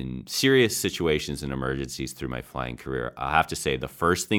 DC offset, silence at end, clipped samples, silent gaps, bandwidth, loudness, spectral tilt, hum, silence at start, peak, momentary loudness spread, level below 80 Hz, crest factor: under 0.1%; 0 s; under 0.1%; none; 19 kHz; -26 LUFS; -4 dB/octave; none; 0 s; -4 dBFS; 12 LU; -44 dBFS; 22 dB